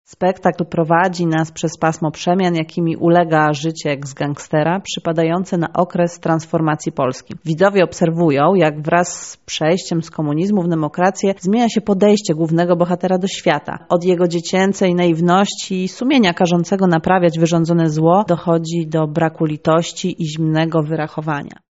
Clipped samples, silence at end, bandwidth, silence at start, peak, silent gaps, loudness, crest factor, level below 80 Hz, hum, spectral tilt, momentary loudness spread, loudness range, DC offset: under 0.1%; 0.15 s; 8 kHz; 0.1 s; 0 dBFS; none; -17 LUFS; 16 dB; -56 dBFS; none; -5.5 dB/octave; 8 LU; 3 LU; 0.1%